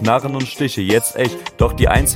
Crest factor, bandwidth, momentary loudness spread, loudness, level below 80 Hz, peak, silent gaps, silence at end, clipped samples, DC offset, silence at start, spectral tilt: 16 dB; 16.5 kHz; 7 LU; -17 LUFS; -26 dBFS; 0 dBFS; none; 0 s; under 0.1%; under 0.1%; 0 s; -4.5 dB/octave